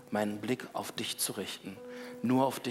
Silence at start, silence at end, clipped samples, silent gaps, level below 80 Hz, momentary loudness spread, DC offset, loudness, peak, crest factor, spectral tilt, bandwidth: 0 s; 0 s; under 0.1%; none; -78 dBFS; 15 LU; under 0.1%; -34 LUFS; -14 dBFS; 20 dB; -4 dB/octave; 16 kHz